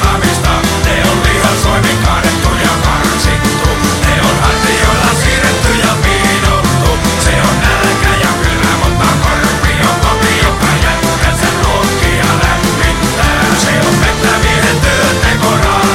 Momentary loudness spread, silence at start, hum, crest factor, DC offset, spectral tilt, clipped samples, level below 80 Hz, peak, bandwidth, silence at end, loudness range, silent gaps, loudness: 2 LU; 0 s; none; 10 dB; under 0.1%; -4 dB/octave; under 0.1%; -18 dBFS; 0 dBFS; 17 kHz; 0 s; 1 LU; none; -10 LUFS